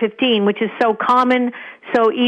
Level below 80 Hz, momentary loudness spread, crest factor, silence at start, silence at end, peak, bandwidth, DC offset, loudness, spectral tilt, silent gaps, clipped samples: -64 dBFS; 7 LU; 12 dB; 0 s; 0 s; -4 dBFS; 9 kHz; under 0.1%; -17 LUFS; -6 dB/octave; none; under 0.1%